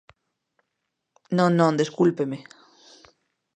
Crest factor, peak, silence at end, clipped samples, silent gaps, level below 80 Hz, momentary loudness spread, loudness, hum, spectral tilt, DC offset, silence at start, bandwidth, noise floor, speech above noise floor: 22 dB; -4 dBFS; 1.15 s; under 0.1%; none; -70 dBFS; 11 LU; -22 LUFS; none; -7 dB/octave; under 0.1%; 1.3 s; 9.4 kHz; -80 dBFS; 59 dB